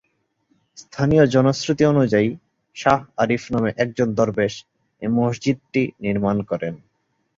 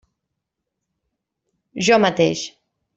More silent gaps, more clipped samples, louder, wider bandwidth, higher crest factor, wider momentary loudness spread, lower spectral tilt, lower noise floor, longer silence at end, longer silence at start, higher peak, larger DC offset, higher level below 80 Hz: neither; neither; about the same, -20 LUFS vs -18 LUFS; about the same, 7.8 kHz vs 8.2 kHz; about the same, 18 dB vs 20 dB; second, 14 LU vs 18 LU; first, -6.5 dB/octave vs -4 dB/octave; second, -68 dBFS vs -80 dBFS; first, 0.6 s vs 0.45 s; second, 0.75 s vs 1.75 s; about the same, -2 dBFS vs -2 dBFS; neither; first, -50 dBFS vs -62 dBFS